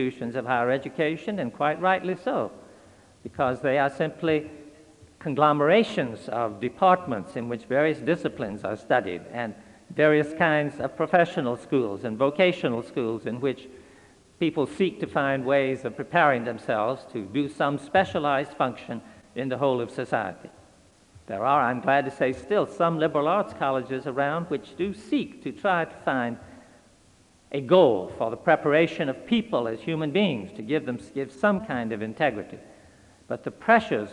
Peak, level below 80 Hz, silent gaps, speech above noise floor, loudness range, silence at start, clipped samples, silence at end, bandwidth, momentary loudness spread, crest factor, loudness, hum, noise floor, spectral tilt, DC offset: -6 dBFS; -64 dBFS; none; 33 dB; 4 LU; 0 s; under 0.1%; 0 s; 11 kHz; 12 LU; 20 dB; -25 LUFS; none; -58 dBFS; -6.5 dB/octave; under 0.1%